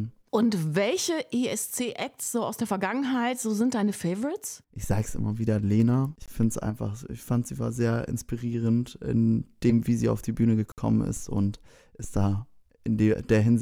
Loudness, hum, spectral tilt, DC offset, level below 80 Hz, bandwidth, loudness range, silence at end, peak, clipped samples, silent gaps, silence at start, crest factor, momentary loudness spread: -27 LUFS; none; -6 dB/octave; under 0.1%; -48 dBFS; 16.5 kHz; 2 LU; 0 s; -8 dBFS; under 0.1%; 10.72-10.76 s; 0 s; 18 dB; 8 LU